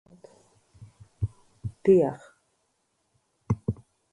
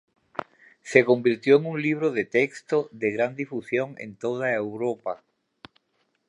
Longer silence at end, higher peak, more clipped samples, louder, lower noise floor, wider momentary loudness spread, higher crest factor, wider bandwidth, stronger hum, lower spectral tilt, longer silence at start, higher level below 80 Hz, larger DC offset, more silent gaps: second, 0.4 s vs 1.1 s; second, -8 dBFS vs -2 dBFS; neither; about the same, -26 LUFS vs -24 LUFS; about the same, -74 dBFS vs -72 dBFS; first, 20 LU vs 17 LU; about the same, 22 dB vs 24 dB; about the same, 10.5 kHz vs 11 kHz; neither; first, -10 dB/octave vs -6.5 dB/octave; first, 1.2 s vs 0.4 s; first, -50 dBFS vs -74 dBFS; neither; neither